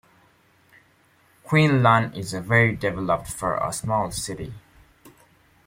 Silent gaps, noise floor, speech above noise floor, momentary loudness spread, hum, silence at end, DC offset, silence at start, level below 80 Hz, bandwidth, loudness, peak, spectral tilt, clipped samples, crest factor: none; -60 dBFS; 38 dB; 13 LU; none; 0.55 s; under 0.1%; 1.45 s; -52 dBFS; 16.5 kHz; -22 LUFS; -2 dBFS; -5.5 dB/octave; under 0.1%; 22 dB